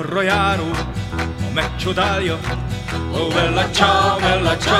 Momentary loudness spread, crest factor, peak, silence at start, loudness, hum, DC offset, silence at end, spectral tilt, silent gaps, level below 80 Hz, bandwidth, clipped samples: 10 LU; 18 dB; 0 dBFS; 0 s; -18 LUFS; none; 0.1%; 0 s; -4.5 dB/octave; none; -32 dBFS; 15.5 kHz; under 0.1%